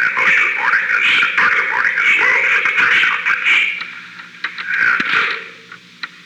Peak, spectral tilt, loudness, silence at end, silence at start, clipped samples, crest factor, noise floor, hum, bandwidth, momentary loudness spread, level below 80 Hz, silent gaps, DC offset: -4 dBFS; -1 dB/octave; -13 LUFS; 0.2 s; 0 s; under 0.1%; 12 dB; -39 dBFS; none; 13.5 kHz; 16 LU; -68 dBFS; none; under 0.1%